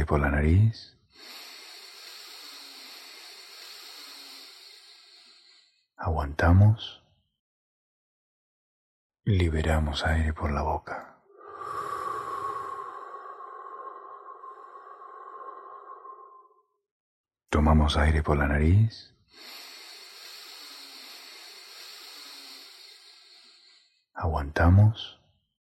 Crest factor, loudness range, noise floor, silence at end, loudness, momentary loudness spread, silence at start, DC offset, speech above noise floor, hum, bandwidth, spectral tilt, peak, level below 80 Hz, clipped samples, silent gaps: 22 dB; 18 LU; -62 dBFS; 0.55 s; -26 LUFS; 23 LU; 0 s; under 0.1%; 39 dB; none; 14 kHz; -7 dB/octave; -8 dBFS; -36 dBFS; under 0.1%; 7.39-9.10 s, 16.91-17.24 s